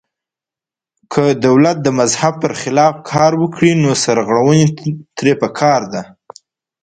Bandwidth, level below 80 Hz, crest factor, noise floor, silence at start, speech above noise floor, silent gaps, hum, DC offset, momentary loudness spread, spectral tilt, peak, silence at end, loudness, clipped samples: 9.4 kHz; -52 dBFS; 14 dB; -89 dBFS; 1.1 s; 76 dB; none; none; under 0.1%; 8 LU; -5.5 dB/octave; 0 dBFS; 0.8 s; -13 LUFS; under 0.1%